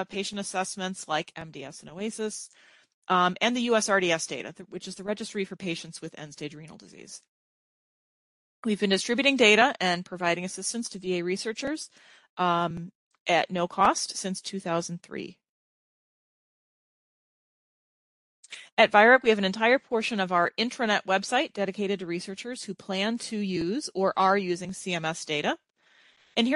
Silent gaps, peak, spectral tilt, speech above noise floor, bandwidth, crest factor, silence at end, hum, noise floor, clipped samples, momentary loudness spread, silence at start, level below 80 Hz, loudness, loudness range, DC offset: 2.94-3.02 s, 7.28-8.63 s, 12.29-12.37 s, 12.95-13.11 s, 13.20-13.26 s, 15.49-18.43 s, 18.72-18.77 s; -4 dBFS; -3.5 dB/octave; 35 dB; 11.5 kHz; 24 dB; 0 s; none; -62 dBFS; under 0.1%; 18 LU; 0 s; -68 dBFS; -26 LUFS; 13 LU; under 0.1%